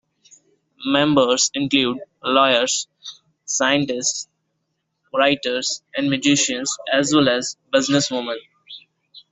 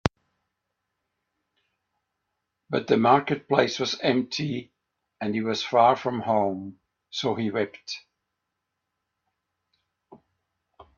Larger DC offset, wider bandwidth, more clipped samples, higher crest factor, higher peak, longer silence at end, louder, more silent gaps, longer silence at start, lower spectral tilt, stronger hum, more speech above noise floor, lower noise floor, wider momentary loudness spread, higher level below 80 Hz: neither; about the same, 8.2 kHz vs 7.8 kHz; neither; second, 20 dB vs 28 dB; about the same, -2 dBFS vs 0 dBFS; second, 0.15 s vs 0.85 s; first, -19 LUFS vs -25 LUFS; neither; first, 0.8 s vs 0.05 s; second, -2.5 dB/octave vs -5.5 dB/octave; neither; second, 54 dB vs 58 dB; second, -74 dBFS vs -82 dBFS; first, 18 LU vs 15 LU; about the same, -60 dBFS vs -60 dBFS